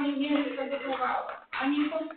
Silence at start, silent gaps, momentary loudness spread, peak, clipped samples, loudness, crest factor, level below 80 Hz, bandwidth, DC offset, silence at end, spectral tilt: 0 s; none; 5 LU; -14 dBFS; under 0.1%; -30 LUFS; 16 dB; -70 dBFS; 4.5 kHz; under 0.1%; 0 s; -1 dB/octave